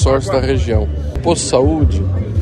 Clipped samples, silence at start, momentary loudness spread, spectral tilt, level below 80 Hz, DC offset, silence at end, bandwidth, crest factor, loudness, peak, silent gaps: under 0.1%; 0 s; 5 LU; -6 dB/octave; -20 dBFS; under 0.1%; 0 s; 10.5 kHz; 14 dB; -15 LUFS; 0 dBFS; none